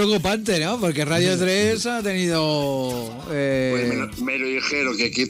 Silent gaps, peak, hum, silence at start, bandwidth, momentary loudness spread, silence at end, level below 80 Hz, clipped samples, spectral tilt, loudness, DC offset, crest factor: none; -8 dBFS; none; 0 s; 16 kHz; 6 LU; 0 s; -50 dBFS; under 0.1%; -4.5 dB/octave; -22 LUFS; under 0.1%; 14 dB